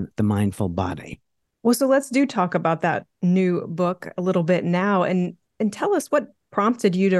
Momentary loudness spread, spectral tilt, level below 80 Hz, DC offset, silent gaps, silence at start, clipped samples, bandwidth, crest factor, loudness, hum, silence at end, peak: 8 LU; -6.5 dB/octave; -58 dBFS; under 0.1%; none; 0 s; under 0.1%; 12.5 kHz; 16 dB; -22 LUFS; none; 0 s; -6 dBFS